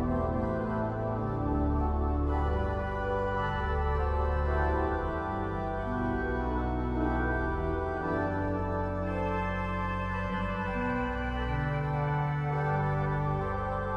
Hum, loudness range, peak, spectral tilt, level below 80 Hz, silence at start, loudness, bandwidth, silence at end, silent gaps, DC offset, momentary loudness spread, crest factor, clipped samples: none; 1 LU; -16 dBFS; -9 dB/octave; -36 dBFS; 0 s; -31 LUFS; 6.2 kHz; 0 s; none; under 0.1%; 3 LU; 14 dB; under 0.1%